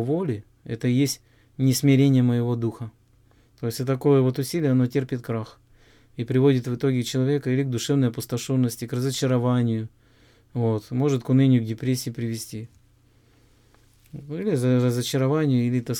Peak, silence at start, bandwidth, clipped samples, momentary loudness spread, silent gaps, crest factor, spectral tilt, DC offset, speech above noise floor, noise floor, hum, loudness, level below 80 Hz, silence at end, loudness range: -8 dBFS; 0 s; 17.5 kHz; under 0.1%; 15 LU; none; 16 dB; -6.5 dB/octave; under 0.1%; 36 dB; -58 dBFS; none; -23 LUFS; -60 dBFS; 0 s; 4 LU